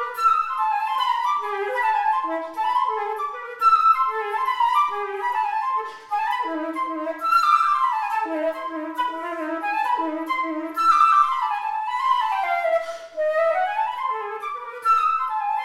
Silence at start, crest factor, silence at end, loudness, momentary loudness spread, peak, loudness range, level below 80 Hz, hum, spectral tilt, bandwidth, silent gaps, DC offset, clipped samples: 0 s; 16 dB; 0 s; -22 LUFS; 10 LU; -6 dBFS; 3 LU; -68 dBFS; none; -1.5 dB/octave; 15.5 kHz; none; under 0.1%; under 0.1%